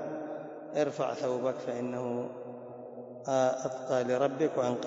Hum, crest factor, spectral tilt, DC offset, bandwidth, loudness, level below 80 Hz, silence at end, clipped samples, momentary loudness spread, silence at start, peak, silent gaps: none; 18 dB; -5.5 dB/octave; under 0.1%; 7.8 kHz; -32 LUFS; -82 dBFS; 0 s; under 0.1%; 15 LU; 0 s; -14 dBFS; none